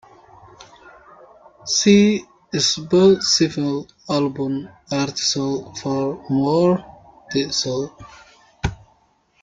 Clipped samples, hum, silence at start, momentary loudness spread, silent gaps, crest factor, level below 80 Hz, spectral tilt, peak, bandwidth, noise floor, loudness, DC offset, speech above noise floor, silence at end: under 0.1%; none; 0.6 s; 14 LU; none; 20 dB; -46 dBFS; -4.5 dB/octave; -2 dBFS; 9.2 kHz; -60 dBFS; -19 LUFS; under 0.1%; 41 dB; 0.7 s